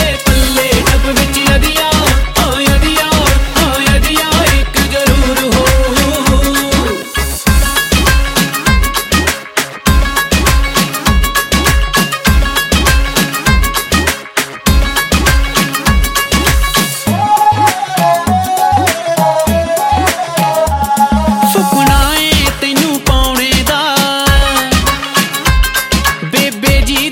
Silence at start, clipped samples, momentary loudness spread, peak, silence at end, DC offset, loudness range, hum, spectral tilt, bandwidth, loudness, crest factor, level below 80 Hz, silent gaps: 0 s; under 0.1%; 3 LU; 0 dBFS; 0 s; under 0.1%; 1 LU; none; -3.5 dB/octave; 17.5 kHz; -11 LUFS; 10 dB; -16 dBFS; none